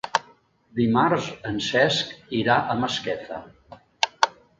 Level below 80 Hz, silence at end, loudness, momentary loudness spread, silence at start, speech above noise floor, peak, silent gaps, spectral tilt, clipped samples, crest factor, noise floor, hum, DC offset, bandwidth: -58 dBFS; 0.3 s; -24 LUFS; 11 LU; 0.05 s; 33 dB; 0 dBFS; none; -4.5 dB/octave; under 0.1%; 24 dB; -56 dBFS; none; under 0.1%; 9 kHz